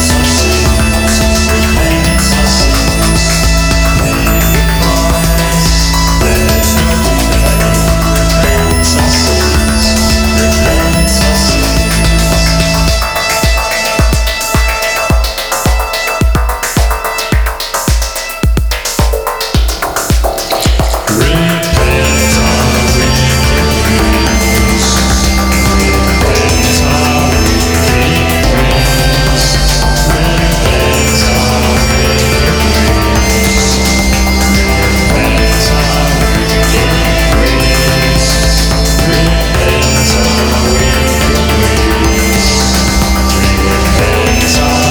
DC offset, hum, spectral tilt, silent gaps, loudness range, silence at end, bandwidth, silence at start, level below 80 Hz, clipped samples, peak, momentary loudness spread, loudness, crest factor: under 0.1%; none; -4 dB/octave; none; 3 LU; 0 s; over 20 kHz; 0 s; -14 dBFS; under 0.1%; 0 dBFS; 3 LU; -10 LUFS; 10 dB